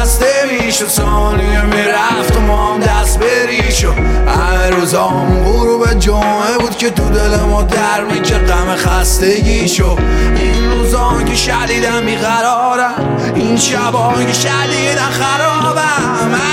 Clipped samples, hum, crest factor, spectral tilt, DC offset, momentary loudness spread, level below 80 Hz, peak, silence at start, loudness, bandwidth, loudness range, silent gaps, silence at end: under 0.1%; none; 10 dB; -4 dB/octave; under 0.1%; 2 LU; -16 dBFS; 0 dBFS; 0 s; -12 LUFS; 16.5 kHz; 1 LU; none; 0 s